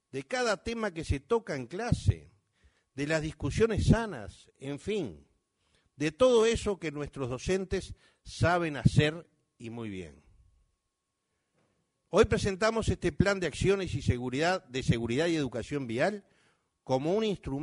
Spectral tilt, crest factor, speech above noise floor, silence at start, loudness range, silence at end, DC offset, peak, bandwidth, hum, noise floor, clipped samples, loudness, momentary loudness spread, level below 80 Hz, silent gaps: -6 dB/octave; 22 dB; 53 dB; 0.15 s; 4 LU; 0 s; under 0.1%; -8 dBFS; 10.5 kHz; none; -83 dBFS; under 0.1%; -30 LUFS; 15 LU; -46 dBFS; none